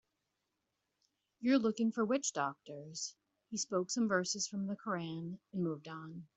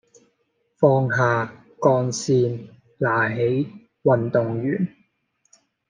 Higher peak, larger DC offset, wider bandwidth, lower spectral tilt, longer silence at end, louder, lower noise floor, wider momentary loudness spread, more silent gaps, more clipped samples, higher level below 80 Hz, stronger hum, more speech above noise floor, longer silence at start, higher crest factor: second, -20 dBFS vs -2 dBFS; neither; second, 8.2 kHz vs 9.6 kHz; second, -4 dB/octave vs -6.5 dB/octave; second, 0.1 s vs 1 s; second, -37 LUFS vs -22 LUFS; first, -86 dBFS vs -70 dBFS; first, 13 LU vs 8 LU; neither; neither; second, -82 dBFS vs -66 dBFS; neither; about the same, 49 dB vs 50 dB; first, 1.4 s vs 0.8 s; about the same, 20 dB vs 20 dB